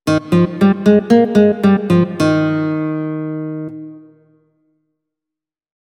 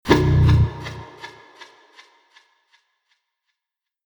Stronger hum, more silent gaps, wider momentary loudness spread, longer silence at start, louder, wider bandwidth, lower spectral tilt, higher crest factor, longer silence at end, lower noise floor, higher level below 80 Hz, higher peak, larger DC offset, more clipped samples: neither; neither; second, 14 LU vs 24 LU; about the same, 0.05 s vs 0.05 s; first, -14 LUFS vs -17 LUFS; second, 12.5 kHz vs over 20 kHz; about the same, -8 dB/octave vs -7.5 dB/octave; second, 16 dB vs 22 dB; second, 1.95 s vs 2.75 s; about the same, -86 dBFS vs -85 dBFS; second, -52 dBFS vs -32 dBFS; about the same, 0 dBFS vs 0 dBFS; neither; neither